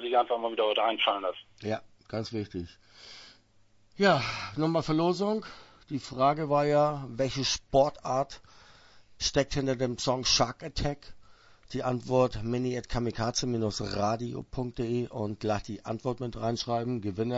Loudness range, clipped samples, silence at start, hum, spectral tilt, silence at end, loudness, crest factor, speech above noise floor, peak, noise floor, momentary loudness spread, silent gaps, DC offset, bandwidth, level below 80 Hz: 4 LU; under 0.1%; 0 s; none; -4.5 dB/octave; 0 s; -30 LUFS; 22 dB; 32 dB; -8 dBFS; -62 dBFS; 12 LU; none; under 0.1%; 8 kHz; -50 dBFS